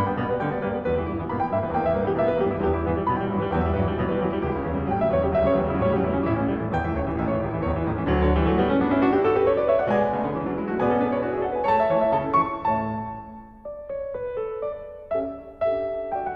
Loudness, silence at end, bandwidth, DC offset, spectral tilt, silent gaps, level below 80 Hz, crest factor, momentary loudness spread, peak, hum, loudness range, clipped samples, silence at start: -24 LUFS; 0 s; 5.8 kHz; under 0.1%; -10 dB/octave; none; -40 dBFS; 14 dB; 9 LU; -10 dBFS; none; 5 LU; under 0.1%; 0 s